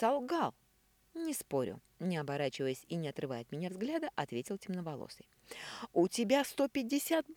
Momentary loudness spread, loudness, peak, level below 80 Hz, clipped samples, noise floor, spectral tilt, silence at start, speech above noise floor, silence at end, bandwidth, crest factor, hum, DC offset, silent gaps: 13 LU; -37 LUFS; -18 dBFS; -74 dBFS; under 0.1%; -71 dBFS; -5 dB/octave; 0 s; 35 dB; 0 s; 20 kHz; 20 dB; none; under 0.1%; none